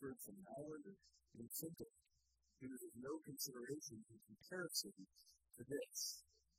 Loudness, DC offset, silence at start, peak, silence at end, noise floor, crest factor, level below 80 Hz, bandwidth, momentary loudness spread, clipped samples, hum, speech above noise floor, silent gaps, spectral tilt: -50 LUFS; under 0.1%; 0 s; -30 dBFS; 0.35 s; -84 dBFS; 24 dB; -84 dBFS; 15.5 kHz; 19 LU; under 0.1%; none; 32 dB; none; -2.5 dB/octave